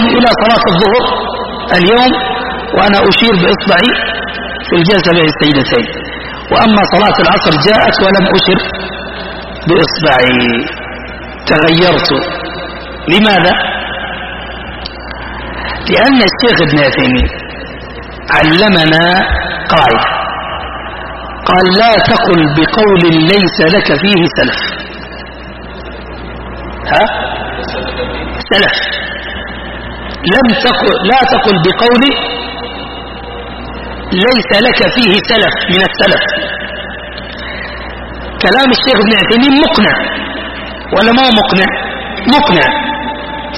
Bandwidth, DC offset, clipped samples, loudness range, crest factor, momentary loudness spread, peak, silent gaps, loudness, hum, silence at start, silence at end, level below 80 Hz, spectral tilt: 12 kHz; under 0.1%; 0.2%; 5 LU; 10 dB; 16 LU; 0 dBFS; none; -9 LUFS; none; 0 s; 0 s; -30 dBFS; -6.5 dB/octave